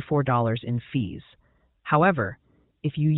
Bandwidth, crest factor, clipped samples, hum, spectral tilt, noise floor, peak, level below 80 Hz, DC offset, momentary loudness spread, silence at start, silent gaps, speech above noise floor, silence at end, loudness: 4.1 kHz; 20 dB; under 0.1%; none; -11.5 dB/octave; -51 dBFS; -6 dBFS; -56 dBFS; under 0.1%; 13 LU; 0 s; none; 27 dB; 0 s; -25 LUFS